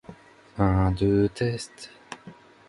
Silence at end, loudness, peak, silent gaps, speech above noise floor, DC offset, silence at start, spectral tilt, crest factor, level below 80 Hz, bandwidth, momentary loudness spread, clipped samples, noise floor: 0.35 s; -24 LUFS; -8 dBFS; none; 25 dB; under 0.1%; 0.1 s; -7.5 dB/octave; 20 dB; -40 dBFS; 11.5 kHz; 20 LU; under 0.1%; -49 dBFS